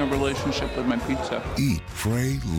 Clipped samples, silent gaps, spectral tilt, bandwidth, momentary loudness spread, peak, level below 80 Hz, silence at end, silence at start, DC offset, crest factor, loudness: under 0.1%; none; -5.5 dB/octave; 17.5 kHz; 3 LU; -10 dBFS; -38 dBFS; 0 s; 0 s; under 0.1%; 14 dB; -26 LUFS